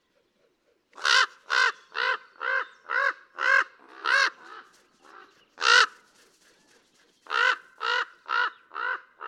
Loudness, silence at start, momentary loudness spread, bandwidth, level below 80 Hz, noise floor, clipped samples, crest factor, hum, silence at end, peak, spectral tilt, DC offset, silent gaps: -25 LUFS; 1 s; 12 LU; 12.5 kHz; -88 dBFS; -69 dBFS; under 0.1%; 24 dB; none; 0 s; -4 dBFS; 3 dB/octave; under 0.1%; none